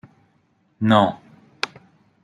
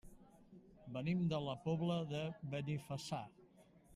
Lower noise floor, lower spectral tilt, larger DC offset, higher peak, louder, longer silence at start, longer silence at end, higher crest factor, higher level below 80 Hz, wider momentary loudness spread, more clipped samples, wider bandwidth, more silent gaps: about the same, -63 dBFS vs -66 dBFS; about the same, -6.5 dB/octave vs -7 dB/octave; neither; first, -2 dBFS vs -26 dBFS; first, -21 LUFS vs -42 LUFS; first, 0.8 s vs 0.05 s; first, 0.55 s vs 0 s; first, 22 dB vs 16 dB; about the same, -66 dBFS vs -70 dBFS; first, 13 LU vs 10 LU; neither; second, 10 kHz vs 12.5 kHz; neither